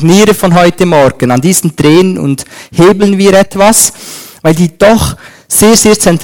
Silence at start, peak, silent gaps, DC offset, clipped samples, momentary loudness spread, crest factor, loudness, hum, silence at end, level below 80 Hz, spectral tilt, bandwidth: 0 s; 0 dBFS; none; under 0.1%; 4%; 10 LU; 6 dB; -7 LUFS; none; 0 s; -32 dBFS; -4.5 dB/octave; over 20 kHz